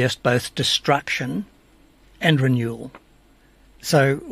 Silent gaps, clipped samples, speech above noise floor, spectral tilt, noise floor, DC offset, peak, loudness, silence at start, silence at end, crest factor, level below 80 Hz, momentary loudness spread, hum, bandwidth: none; under 0.1%; 34 dB; -5 dB/octave; -54 dBFS; under 0.1%; -2 dBFS; -21 LUFS; 0 s; 0 s; 20 dB; -54 dBFS; 15 LU; none; 15.5 kHz